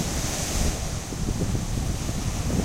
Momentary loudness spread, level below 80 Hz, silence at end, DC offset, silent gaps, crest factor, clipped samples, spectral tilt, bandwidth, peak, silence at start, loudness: 4 LU; -30 dBFS; 0 s; under 0.1%; none; 14 dB; under 0.1%; -4.5 dB/octave; 16 kHz; -12 dBFS; 0 s; -28 LUFS